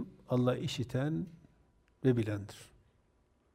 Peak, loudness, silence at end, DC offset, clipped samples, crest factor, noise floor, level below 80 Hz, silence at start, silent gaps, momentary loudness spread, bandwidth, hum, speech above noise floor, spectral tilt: -16 dBFS; -34 LUFS; 0.9 s; under 0.1%; under 0.1%; 20 dB; -71 dBFS; -64 dBFS; 0 s; none; 15 LU; 14 kHz; none; 39 dB; -7 dB/octave